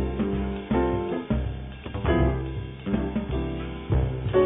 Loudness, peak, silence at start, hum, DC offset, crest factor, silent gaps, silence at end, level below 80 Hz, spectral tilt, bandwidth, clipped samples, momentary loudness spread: -28 LUFS; -10 dBFS; 0 s; none; under 0.1%; 16 dB; none; 0 s; -32 dBFS; -7.5 dB/octave; 3.9 kHz; under 0.1%; 10 LU